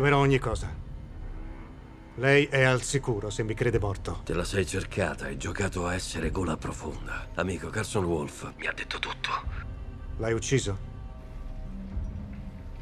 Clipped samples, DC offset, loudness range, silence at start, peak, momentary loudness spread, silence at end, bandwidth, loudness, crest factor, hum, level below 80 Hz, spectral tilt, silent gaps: under 0.1%; under 0.1%; 6 LU; 0 s; -6 dBFS; 20 LU; 0 s; 13.5 kHz; -29 LUFS; 22 dB; none; -40 dBFS; -5 dB/octave; none